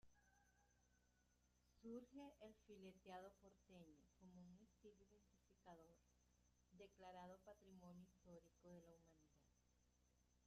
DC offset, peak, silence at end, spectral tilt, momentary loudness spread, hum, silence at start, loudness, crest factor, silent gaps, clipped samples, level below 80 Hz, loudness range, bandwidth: under 0.1%; -46 dBFS; 0 s; -5.5 dB/octave; 9 LU; none; 0.05 s; -65 LUFS; 20 dB; none; under 0.1%; -84 dBFS; 4 LU; 7.4 kHz